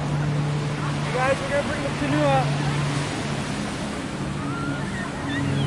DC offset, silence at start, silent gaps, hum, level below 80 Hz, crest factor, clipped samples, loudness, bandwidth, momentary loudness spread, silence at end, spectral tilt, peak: under 0.1%; 0 s; none; none; -44 dBFS; 16 dB; under 0.1%; -25 LUFS; 11.5 kHz; 7 LU; 0 s; -6 dB/octave; -8 dBFS